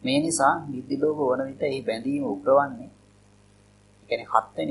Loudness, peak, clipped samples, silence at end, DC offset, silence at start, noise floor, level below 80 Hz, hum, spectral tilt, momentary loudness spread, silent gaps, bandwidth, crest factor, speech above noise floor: -25 LUFS; -4 dBFS; under 0.1%; 0 s; under 0.1%; 0 s; -56 dBFS; -64 dBFS; 50 Hz at -60 dBFS; -4.5 dB/octave; 10 LU; none; 11.5 kHz; 22 dB; 32 dB